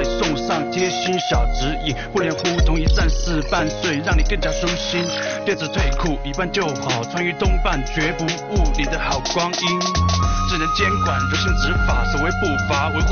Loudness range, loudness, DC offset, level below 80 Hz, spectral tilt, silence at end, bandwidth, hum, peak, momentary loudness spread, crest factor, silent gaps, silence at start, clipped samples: 2 LU; -20 LUFS; under 0.1%; -24 dBFS; -4.5 dB/octave; 0 s; 6.8 kHz; none; -6 dBFS; 4 LU; 14 dB; none; 0 s; under 0.1%